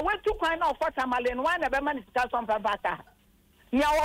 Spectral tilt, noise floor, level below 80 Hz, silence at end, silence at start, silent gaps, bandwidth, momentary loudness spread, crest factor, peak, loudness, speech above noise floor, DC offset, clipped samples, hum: -4 dB/octave; -62 dBFS; -48 dBFS; 0 s; 0 s; none; 16 kHz; 4 LU; 12 dB; -16 dBFS; -28 LUFS; 34 dB; under 0.1%; under 0.1%; none